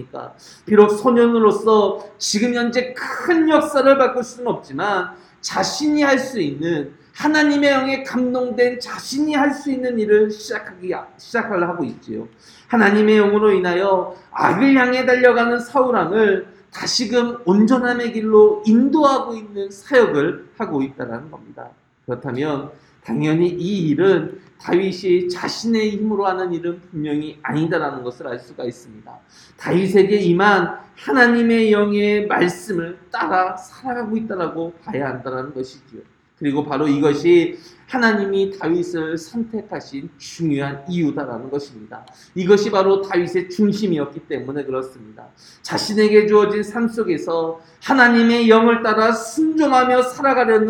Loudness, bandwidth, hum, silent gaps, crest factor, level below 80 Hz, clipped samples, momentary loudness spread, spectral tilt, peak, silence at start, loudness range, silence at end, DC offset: -18 LUFS; 16 kHz; none; none; 18 dB; -60 dBFS; under 0.1%; 15 LU; -5.5 dB/octave; 0 dBFS; 0 s; 8 LU; 0 s; under 0.1%